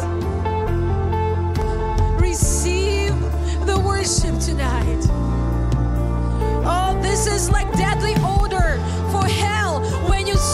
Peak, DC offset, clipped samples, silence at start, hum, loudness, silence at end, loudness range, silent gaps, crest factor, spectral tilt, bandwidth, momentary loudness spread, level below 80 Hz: -4 dBFS; under 0.1%; under 0.1%; 0 s; none; -20 LUFS; 0 s; 1 LU; none; 14 dB; -5 dB/octave; 15 kHz; 3 LU; -22 dBFS